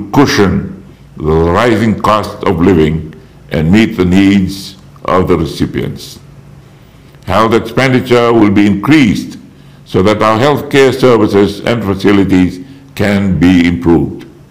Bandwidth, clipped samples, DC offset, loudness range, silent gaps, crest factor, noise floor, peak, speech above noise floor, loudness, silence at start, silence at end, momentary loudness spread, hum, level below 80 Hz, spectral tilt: 16 kHz; under 0.1%; under 0.1%; 4 LU; none; 10 dB; -38 dBFS; 0 dBFS; 29 dB; -10 LUFS; 0 s; 0.2 s; 13 LU; none; -36 dBFS; -6.5 dB/octave